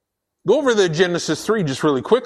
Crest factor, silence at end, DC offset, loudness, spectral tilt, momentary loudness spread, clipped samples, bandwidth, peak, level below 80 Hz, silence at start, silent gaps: 16 dB; 0 s; under 0.1%; -19 LUFS; -5 dB/octave; 5 LU; under 0.1%; 13 kHz; -2 dBFS; -58 dBFS; 0.45 s; none